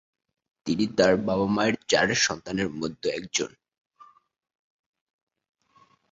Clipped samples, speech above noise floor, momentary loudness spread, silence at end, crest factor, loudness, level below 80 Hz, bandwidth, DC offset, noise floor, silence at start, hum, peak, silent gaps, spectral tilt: under 0.1%; 37 dB; 9 LU; 2.65 s; 22 dB; -25 LUFS; -58 dBFS; 8 kHz; under 0.1%; -62 dBFS; 0.65 s; none; -6 dBFS; none; -3.5 dB/octave